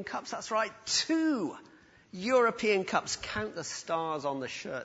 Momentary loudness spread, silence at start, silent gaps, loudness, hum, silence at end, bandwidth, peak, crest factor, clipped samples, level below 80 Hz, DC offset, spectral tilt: 11 LU; 0 s; none; -31 LUFS; none; 0 s; 8 kHz; -12 dBFS; 20 dB; under 0.1%; -64 dBFS; under 0.1%; -3 dB/octave